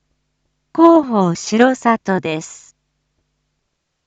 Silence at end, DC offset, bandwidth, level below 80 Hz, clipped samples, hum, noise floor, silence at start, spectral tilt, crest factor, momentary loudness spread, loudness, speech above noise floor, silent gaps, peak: 1.55 s; under 0.1%; 8 kHz; -60 dBFS; under 0.1%; none; -72 dBFS; 0.75 s; -5.5 dB/octave; 16 dB; 15 LU; -15 LUFS; 58 dB; none; 0 dBFS